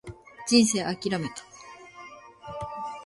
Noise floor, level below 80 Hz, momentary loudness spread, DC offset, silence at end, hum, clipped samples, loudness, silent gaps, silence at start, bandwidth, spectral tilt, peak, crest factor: -47 dBFS; -58 dBFS; 25 LU; under 0.1%; 0 s; none; under 0.1%; -26 LUFS; none; 0.05 s; 11.5 kHz; -3.5 dB/octave; -6 dBFS; 22 dB